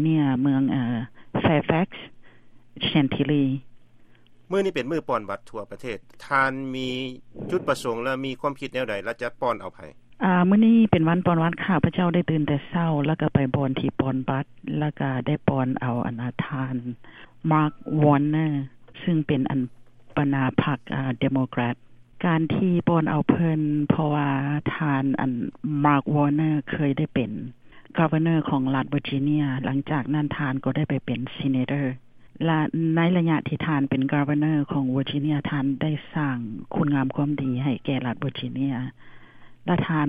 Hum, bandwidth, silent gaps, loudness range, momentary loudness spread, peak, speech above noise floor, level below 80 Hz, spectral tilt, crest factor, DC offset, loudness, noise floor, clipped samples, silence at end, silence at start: none; 10 kHz; none; 5 LU; 10 LU; -2 dBFS; 27 dB; -54 dBFS; -8.5 dB/octave; 22 dB; under 0.1%; -24 LUFS; -50 dBFS; under 0.1%; 0 s; 0 s